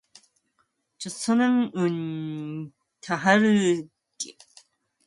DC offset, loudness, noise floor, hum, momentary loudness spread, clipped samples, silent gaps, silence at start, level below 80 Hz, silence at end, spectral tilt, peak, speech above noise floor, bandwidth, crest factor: under 0.1%; -24 LUFS; -72 dBFS; none; 18 LU; under 0.1%; none; 1 s; -72 dBFS; 0.75 s; -5 dB/octave; -4 dBFS; 48 dB; 11.5 kHz; 22 dB